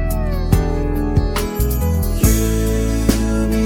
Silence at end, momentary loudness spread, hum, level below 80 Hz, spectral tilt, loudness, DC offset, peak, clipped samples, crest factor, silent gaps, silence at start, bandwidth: 0 s; 4 LU; none; -20 dBFS; -6 dB/octave; -18 LUFS; under 0.1%; 0 dBFS; under 0.1%; 16 dB; none; 0 s; 18 kHz